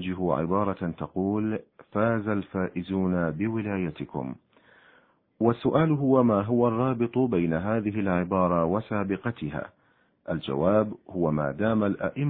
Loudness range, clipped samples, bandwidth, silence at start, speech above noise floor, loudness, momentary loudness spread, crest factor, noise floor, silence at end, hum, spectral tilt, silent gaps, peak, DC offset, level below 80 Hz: 5 LU; under 0.1%; 4.2 kHz; 0 s; 37 dB; -27 LUFS; 11 LU; 18 dB; -63 dBFS; 0 s; none; -12 dB/octave; none; -8 dBFS; under 0.1%; -56 dBFS